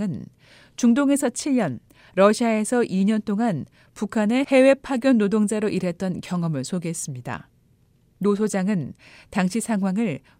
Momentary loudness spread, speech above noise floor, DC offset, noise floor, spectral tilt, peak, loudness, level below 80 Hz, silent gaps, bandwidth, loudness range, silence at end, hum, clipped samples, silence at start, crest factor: 13 LU; 38 dB; under 0.1%; -60 dBFS; -6 dB/octave; -4 dBFS; -22 LUFS; -60 dBFS; none; 16 kHz; 6 LU; 0.2 s; none; under 0.1%; 0 s; 18 dB